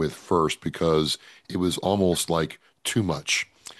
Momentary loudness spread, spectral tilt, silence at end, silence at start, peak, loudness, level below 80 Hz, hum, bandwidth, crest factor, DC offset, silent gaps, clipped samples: 8 LU; -4.5 dB/octave; 0.05 s; 0 s; -8 dBFS; -25 LUFS; -50 dBFS; none; 12.5 kHz; 18 dB; under 0.1%; none; under 0.1%